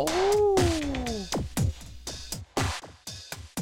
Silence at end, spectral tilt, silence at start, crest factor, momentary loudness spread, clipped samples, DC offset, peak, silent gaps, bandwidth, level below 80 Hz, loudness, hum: 0 s; -4.5 dB/octave; 0 s; 16 dB; 16 LU; under 0.1%; under 0.1%; -12 dBFS; none; 17 kHz; -40 dBFS; -28 LUFS; none